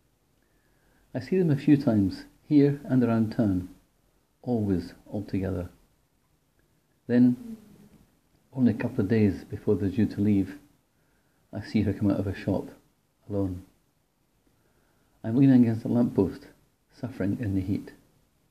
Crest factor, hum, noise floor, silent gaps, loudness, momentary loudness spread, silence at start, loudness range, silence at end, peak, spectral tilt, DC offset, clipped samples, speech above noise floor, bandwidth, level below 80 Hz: 18 dB; none; -70 dBFS; none; -26 LUFS; 18 LU; 1.15 s; 6 LU; 0.6 s; -8 dBFS; -9.5 dB/octave; under 0.1%; under 0.1%; 45 dB; 14 kHz; -60 dBFS